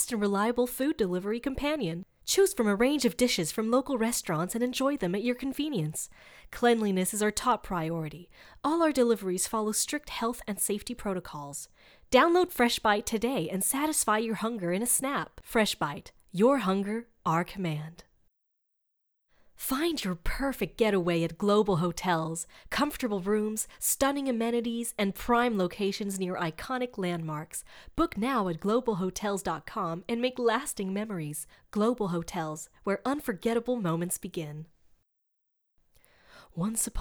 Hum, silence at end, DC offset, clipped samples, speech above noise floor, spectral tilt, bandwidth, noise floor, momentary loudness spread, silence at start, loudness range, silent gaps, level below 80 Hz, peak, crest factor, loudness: none; 0 s; under 0.1%; under 0.1%; 50 dB; -4 dB/octave; over 20 kHz; -79 dBFS; 10 LU; 0 s; 5 LU; none; -52 dBFS; -8 dBFS; 20 dB; -29 LUFS